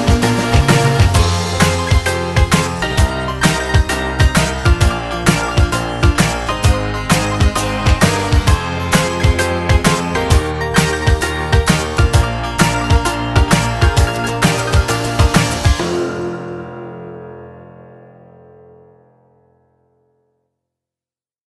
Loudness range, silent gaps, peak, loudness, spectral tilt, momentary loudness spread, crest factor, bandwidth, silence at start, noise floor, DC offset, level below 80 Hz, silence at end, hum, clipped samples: 4 LU; none; 0 dBFS; -15 LUFS; -5 dB/octave; 5 LU; 14 dB; 13 kHz; 0 s; under -90 dBFS; under 0.1%; -20 dBFS; 3.65 s; none; under 0.1%